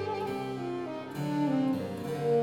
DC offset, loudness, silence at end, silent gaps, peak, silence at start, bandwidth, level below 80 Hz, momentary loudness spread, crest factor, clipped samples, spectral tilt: under 0.1%; -32 LUFS; 0 s; none; -18 dBFS; 0 s; 17.5 kHz; -68 dBFS; 7 LU; 14 dB; under 0.1%; -7.5 dB/octave